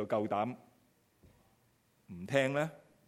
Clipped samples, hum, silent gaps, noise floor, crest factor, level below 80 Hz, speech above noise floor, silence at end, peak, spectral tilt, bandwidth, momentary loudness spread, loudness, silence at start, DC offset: under 0.1%; none; none; -72 dBFS; 24 dB; -76 dBFS; 37 dB; 0.3 s; -14 dBFS; -6 dB/octave; 15 kHz; 19 LU; -34 LUFS; 0 s; under 0.1%